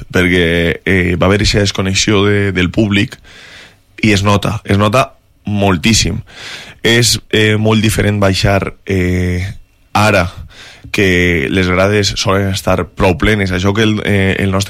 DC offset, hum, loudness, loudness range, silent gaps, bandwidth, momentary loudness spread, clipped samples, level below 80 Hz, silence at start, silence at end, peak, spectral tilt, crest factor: under 0.1%; none; -12 LUFS; 2 LU; none; 15.5 kHz; 8 LU; under 0.1%; -30 dBFS; 0 s; 0 s; 0 dBFS; -4.5 dB/octave; 12 dB